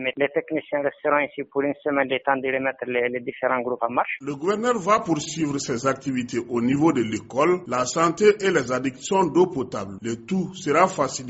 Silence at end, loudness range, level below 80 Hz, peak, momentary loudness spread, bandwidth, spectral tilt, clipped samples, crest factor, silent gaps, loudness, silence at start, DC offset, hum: 0 s; 3 LU; -60 dBFS; -4 dBFS; 7 LU; 8 kHz; -4.5 dB/octave; under 0.1%; 20 dB; none; -23 LUFS; 0 s; under 0.1%; none